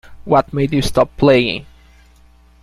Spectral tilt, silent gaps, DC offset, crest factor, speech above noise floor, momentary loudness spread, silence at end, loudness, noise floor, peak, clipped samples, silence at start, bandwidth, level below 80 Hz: -6 dB/octave; none; under 0.1%; 16 dB; 33 dB; 7 LU; 1 s; -15 LUFS; -48 dBFS; -2 dBFS; under 0.1%; 0.1 s; 15 kHz; -36 dBFS